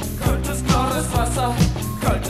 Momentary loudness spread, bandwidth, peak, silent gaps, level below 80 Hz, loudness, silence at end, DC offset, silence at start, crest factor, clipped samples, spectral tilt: 3 LU; 16 kHz; -6 dBFS; none; -26 dBFS; -21 LUFS; 0 s; under 0.1%; 0 s; 14 dB; under 0.1%; -5 dB/octave